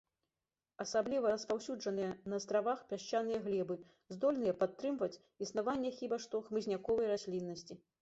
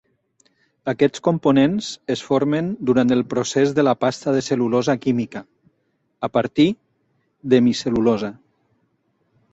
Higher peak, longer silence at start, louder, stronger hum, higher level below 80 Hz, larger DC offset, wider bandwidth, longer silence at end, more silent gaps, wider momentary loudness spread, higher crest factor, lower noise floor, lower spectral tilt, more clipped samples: second, -20 dBFS vs -2 dBFS; about the same, 0.8 s vs 0.85 s; second, -38 LUFS vs -20 LUFS; neither; second, -74 dBFS vs -56 dBFS; neither; about the same, 8 kHz vs 8.2 kHz; second, 0.25 s vs 1.2 s; neither; second, 8 LU vs 11 LU; about the same, 18 dB vs 18 dB; first, under -90 dBFS vs -69 dBFS; second, -4.5 dB/octave vs -6 dB/octave; neither